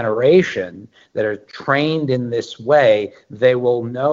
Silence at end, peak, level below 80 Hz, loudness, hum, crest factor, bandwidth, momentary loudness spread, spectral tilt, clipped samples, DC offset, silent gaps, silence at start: 0 s; -2 dBFS; -62 dBFS; -17 LUFS; none; 16 dB; 7.6 kHz; 13 LU; -6.5 dB/octave; under 0.1%; under 0.1%; none; 0 s